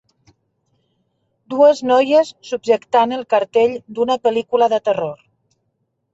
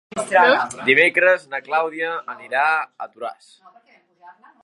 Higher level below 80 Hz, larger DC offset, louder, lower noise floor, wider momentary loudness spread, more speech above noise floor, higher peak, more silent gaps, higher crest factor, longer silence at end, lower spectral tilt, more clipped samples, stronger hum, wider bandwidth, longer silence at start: first, -66 dBFS vs -72 dBFS; neither; about the same, -17 LUFS vs -18 LUFS; first, -70 dBFS vs -49 dBFS; second, 9 LU vs 17 LU; first, 54 dB vs 29 dB; about the same, -2 dBFS vs 0 dBFS; neither; about the same, 16 dB vs 20 dB; first, 1 s vs 0.35 s; first, -4.5 dB/octave vs -3 dB/octave; neither; neither; second, 8 kHz vs 11.5 kHz; first, 1.5 s vs 0.15 s